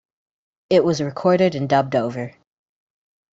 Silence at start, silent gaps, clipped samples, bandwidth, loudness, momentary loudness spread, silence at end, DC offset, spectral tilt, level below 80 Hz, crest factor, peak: 0.7 s; none; under 0.1%; 7.8 kHz; -19 LUFS; 11 LU; 1.05 s; under 0.1%; -6.5 dB/octave; -60 dBFS; 18 dB; -4 dBFS